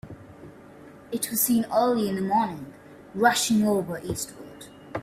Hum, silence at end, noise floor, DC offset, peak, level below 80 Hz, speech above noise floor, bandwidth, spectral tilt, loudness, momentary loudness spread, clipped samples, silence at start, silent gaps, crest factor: none; 0 s; -47 dBFS; under 0.1%; -6 dBFS; -60 dBFS; 23 dB; 16 kHz; -4 dB/octave; -24 LUFS; 22 LU; under 0.1%; 0.05 s; none; 20 dB